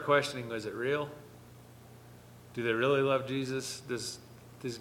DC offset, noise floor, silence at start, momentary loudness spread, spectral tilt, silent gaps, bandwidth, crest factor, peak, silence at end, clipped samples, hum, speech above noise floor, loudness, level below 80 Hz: under 0.1%; -53 dBFS; 0 s; 25 LU; -4.5 dB/octave; none; 18.5 kHz; 22 dB; -12 dBFS; 0 s; under 0.1%; 60 Hz at -55 dBFS; 22 dB; -33 LUFS; -68 dBFS